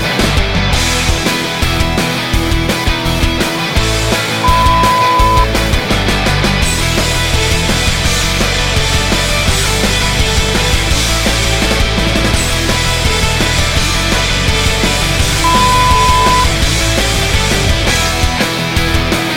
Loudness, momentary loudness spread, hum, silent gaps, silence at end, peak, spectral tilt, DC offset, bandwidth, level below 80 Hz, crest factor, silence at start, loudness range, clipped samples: -12 LUFS; 4 LU; none; none; 0 s; 0 dBFS; -3.5 dB/octave; under 0.1%; 16.5 kHz; -18 dBFS; 12 dB; 0 s; 2 LU; under 0.1%